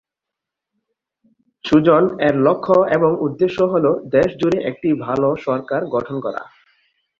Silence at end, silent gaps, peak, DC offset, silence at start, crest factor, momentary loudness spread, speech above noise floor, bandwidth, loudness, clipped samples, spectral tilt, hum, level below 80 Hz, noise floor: 0.75 s; none; -2 dBFS; under 0.1%; 1.65 s; 16 dB; 8 LU; 68 dB; 7.4 kHz; -17 LUFS; under 0.1%; -8 dB/octave; none; -54 dBFS; -84 dBFS